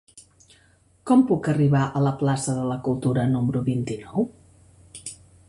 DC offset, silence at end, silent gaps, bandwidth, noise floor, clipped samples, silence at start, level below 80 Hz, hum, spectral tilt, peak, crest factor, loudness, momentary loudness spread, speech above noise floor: under 0.1%; 0.35 s; none; 11.5 kHz; -59 dBFS; under 0.1%; 0.15 s; -54 dBFS; none; -7 dB/octave; -8 dBFS; 16 dB; -23 LUFS; 18 LU; 37 dB